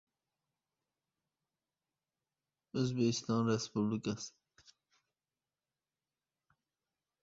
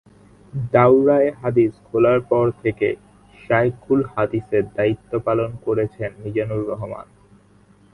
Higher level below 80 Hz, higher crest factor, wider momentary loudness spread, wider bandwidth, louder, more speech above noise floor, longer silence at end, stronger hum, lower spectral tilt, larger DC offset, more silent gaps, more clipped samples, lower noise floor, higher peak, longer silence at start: second, -74 dBFS vs -52 dBFS; about the same, 22 dB vs 20 dB; about the same, 11 LU vs 13 LU; second, 7.6 kHz vs 10.5 kHz; second, -36 LUFS vs -20 LUFS; first, over 55 dB vs 33 dB; first, 2.95 s vs 0.9 s; second, none vs 50 Hz at -45 dBFS; second, -6.5 dB/octave vs -9.5 dB/octave; neither; neither; neither; first, under -90 dBFS vs -52 dBFS; second, -20 dBFS vs 0 dBFS; first, 2.75 s vs 0.55 s